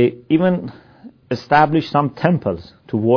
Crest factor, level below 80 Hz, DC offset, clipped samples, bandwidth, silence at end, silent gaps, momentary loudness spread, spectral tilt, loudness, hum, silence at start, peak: 18 dB; -52 dBFS; under 0.1%; under 0.1%; 5.4 kHz; 0 s; none; 13 LU; -8.5 dB/octave; -18 LUFS; none; 0 s; 0 dBFS